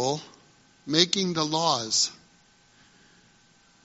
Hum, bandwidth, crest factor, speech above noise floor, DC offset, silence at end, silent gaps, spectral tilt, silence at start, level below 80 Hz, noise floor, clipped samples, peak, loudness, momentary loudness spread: none; 8 kHz; 26 dB; 34 dB; under 0.1%; 1.7 s; none; -2.5 dB/octave; 0 s; -70 dBFS; -60 dBFS; under 0.1%; -2 dBFS; -24 LUFS; 9 LU